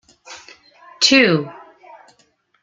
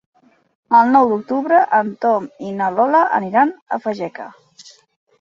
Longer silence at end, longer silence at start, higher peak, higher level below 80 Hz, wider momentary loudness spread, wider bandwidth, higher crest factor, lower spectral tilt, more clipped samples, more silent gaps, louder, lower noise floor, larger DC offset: first, 1.1 s vs 0.5 s; second, 0.3 s vs 0.7 s; about the same, -2 dBFS vs 0 dBFS; about the same, -64 dBFS vs -66 dBFS; first, 27 LU vs 13 LU; first, 9.6 kHz vs 7.6 kHz; about the same, 20 dB vs 16 dB; second, -3 dB/octave vs -7 dB/octave; neither; second, none vs 3.62-3.66 s; about the same, -14 LUFS vs -16 LUFS; first, -60 dBFS vs -46 dBFS; neither